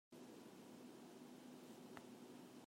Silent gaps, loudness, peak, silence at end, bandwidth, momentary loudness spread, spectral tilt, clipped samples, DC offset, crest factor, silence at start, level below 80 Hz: none; -60 LUFS; -36 dBFS; 0 s; 16 kHz; 2 LU; -4.5 dB/octave; under 0.1%; under 0.1%; 24 dB; 0.1 s; under -90 dBFS